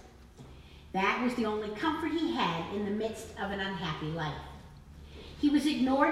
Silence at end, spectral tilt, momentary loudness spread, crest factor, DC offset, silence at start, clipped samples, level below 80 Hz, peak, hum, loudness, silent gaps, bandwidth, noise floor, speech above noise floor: 0 s; -5.5 dB/octave; 23 LU; 22 dB; under 0.1%; 0.05 s; under 0.1%; -54 dBFS; -10 dBFS; none; -32 LUFS; none; 14.5 kHz; -52 dBFS; 21 dB